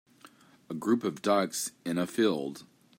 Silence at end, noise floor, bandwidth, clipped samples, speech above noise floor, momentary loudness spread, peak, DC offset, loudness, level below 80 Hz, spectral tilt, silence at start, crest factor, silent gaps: 0.35 s; -57 dBFS; 16 kHz; under 0.1%; 28 dB; 12 LU; -14 dBFS; under 0.1%; -30 LUFS; -80 dBFS; -4.5 dB/octave; 0.7 s; 18 dB; none